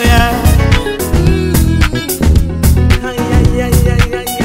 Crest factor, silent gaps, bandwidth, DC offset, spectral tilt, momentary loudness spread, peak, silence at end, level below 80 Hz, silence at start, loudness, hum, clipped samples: 10 dB; none; 16.5 kHz; 0.5%; -5.5 dB/octave; 4 LU; 0 dBFS; 0 s; -14 dBFS; 0 s; -12 LUFS; none; under 0.1%